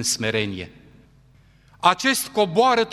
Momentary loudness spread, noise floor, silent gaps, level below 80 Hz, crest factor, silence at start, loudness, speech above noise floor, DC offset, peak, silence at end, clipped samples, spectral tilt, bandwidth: 13 LU; -54 dBFS; none; -58 dBFS; 20 dB; 0 s; -20 LUFS; 33 dB; under 0.1%; -2 dBFS; 0 s; under 0.1%; -3 dB/octave; 14.5 kHz